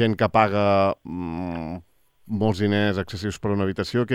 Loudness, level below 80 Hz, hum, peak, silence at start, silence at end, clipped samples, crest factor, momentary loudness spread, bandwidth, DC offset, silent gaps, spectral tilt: -23 LUFS; -54 dBFS; none; -4 dBFS; 0 s; 0 s; under 0.1%; 20 dB; 12 LU; 13.5 kHz; under 0.1%; none; -7 dB/octave